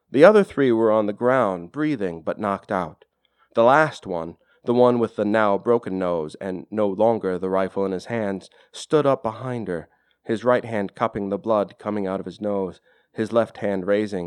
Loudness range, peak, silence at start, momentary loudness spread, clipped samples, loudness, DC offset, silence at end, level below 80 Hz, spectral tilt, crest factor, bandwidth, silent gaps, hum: 4 LU; 0 dBFS; 0.1 s; 12 LU; under 0.1%; -22 LUFS; under 0.1%; 0 s; -62 dBFS; -7 dB/octave; 22 dB; 11 kHz; none; none